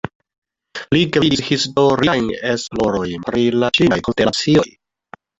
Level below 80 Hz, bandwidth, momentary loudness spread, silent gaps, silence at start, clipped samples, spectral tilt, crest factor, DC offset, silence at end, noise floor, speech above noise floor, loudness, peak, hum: -46 dBFS; 8.4 kHz; 8 LU; 0.15-0.20 s, 0.38-0.42 s; 0.05 s; under 0.1%; -5 dB/octave; 16 dB; under 0.1%; 0.7 s; -44 dBFS; 28 dB; -16 LUFS; -2 dBFS; none